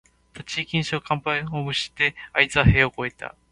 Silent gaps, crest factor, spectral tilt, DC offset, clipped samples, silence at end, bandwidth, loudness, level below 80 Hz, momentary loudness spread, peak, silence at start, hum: none; 24 dB; -5 dB/octave; under 0.1%; under 0.1%; 0.25 s; 11.5 kHz; -22 LUFS; -38 dBFS; 13 LU; 0 dBFS; 0.35 s; none